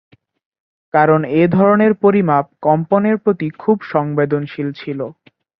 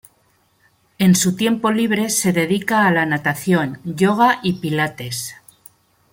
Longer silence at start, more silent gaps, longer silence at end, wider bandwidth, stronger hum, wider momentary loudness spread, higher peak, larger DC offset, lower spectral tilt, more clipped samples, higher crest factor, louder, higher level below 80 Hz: about the same, 0.95 s vs 1 s; neither; second, 0.45 s vs 0.8 s; second, 5.4 kHz vs 17 kHz; neither; first, 12 LU vs 9 LU; about the same, -2 dBFS vs -2 dBFS; neither; first, -11 dB/octave vs -4.5 dB/octave; neither; about the same, 14 dB vs 16 dB; first, -15 LUFS vs -18 LUFS; about the same, -58 dBFS vs -58 dBFS